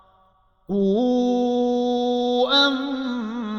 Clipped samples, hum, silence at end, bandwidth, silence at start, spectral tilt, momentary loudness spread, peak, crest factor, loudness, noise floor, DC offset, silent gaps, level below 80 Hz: under 0.1%; none; 0 s; 7 kHz; 0.7 s; -5.5 dB/octave; 10 LU; -8 dBFS; 14 dB; -21 LUFS; -60 dBFS; under 0.1%; none; -60 dBFS